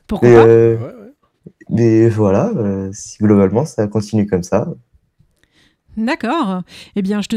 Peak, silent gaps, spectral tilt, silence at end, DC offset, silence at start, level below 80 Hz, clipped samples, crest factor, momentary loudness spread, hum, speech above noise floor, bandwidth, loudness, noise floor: 0 dBFS; none; -7.5 dB/octave; 0 s; under 0.1%; 0.1 s; -48 dBFS; under 0.1%; 14 dB; 16 LU; none; 44 dB; 11.5 kHz; -14 LUFS; -57 dBFS